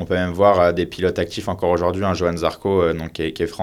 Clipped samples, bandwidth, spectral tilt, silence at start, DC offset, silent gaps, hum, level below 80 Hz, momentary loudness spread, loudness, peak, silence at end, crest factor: under 0.1%; 15 kHz; -6.5 dB/octave; 0 s; under 0.1%; none; none; -42 dBFS; 9 LU; -20 LUFS; -2 dBFS; 0 s; 18 dB